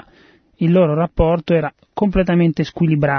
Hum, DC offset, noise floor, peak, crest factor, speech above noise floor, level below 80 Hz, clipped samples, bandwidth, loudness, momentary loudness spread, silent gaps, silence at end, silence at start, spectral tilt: none; under 0.1%; -51 dBFS; -2 dBFS; 16 dB; 35 dB; -32 dBFS; under 0.1%; 6.4 kHz; -17 LUFS; 6 LU; none; 0 s; 0.6 s; -9 dB/octave